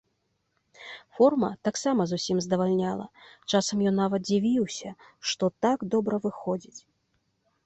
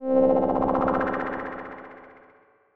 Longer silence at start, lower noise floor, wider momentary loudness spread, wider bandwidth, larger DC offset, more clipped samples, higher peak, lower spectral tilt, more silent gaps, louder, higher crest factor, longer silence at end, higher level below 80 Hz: first, 0.8 s vs 0 s; first, -75 dBFS vs -58 dBFS; about the same, 18 LU vs 20 LU; first, 8.2 kHz vs 4.7 kHz; neither; neither; about the same, -8 dBFS vs -8 dBFS; second, -5 dB/octave vs -9.5 dB/octave; neither; second, -27 LUFS vs -24 LUFS; about the same, 18 dB vs 18 dB; first, 0.85 s vs 0.45 s; second, -66 dBFS vs -52 dBFS